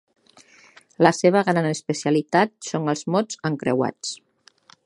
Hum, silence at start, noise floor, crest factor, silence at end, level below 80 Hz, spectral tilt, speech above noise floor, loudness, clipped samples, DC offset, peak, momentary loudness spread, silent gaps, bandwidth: none; 1 s; -55 dBFS; 22 dB; 0.7 s; -68 dBFS; -5.5 dB/octave; 33 dB; -22 LUFS; under 0.1%; under 0.1%; 0 dBFS; 9 LU; none; 11.5 kHz